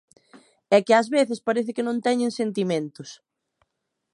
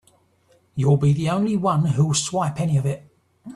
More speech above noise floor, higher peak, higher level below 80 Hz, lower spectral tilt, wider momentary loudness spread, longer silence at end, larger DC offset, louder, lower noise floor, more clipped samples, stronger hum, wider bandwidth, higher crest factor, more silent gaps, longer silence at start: first, 56 dB vs 40 dB; about the same, -4 dBFS vs -6 dBFS; second, -78 dBFS vs -56 dBFS; about the same, -5 dB/octave vs -6 dB/octave; first, 13 LU vs 7 LU; first, 1 s vs 0 s; neither; about the same, -23 LUFS vs -21 LUFS; first, -79 dBFS vs -60 dBFS; neither; neither; about the same, 11 kHz vs 12 kHz; about the same, 20 dB vs 16 dB; neither; about the same, 0.7 s vs 0.75 s